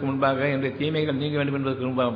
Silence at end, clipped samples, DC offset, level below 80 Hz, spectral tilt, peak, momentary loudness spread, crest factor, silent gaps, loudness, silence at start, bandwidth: 0 s; under 0.1%; under 0.1%; -60 dBFS; -9.5 dB/octave; -10 dBFS; 3 LU; 14 dB; none; -25 LUFS; 0 s; 5.2 kHz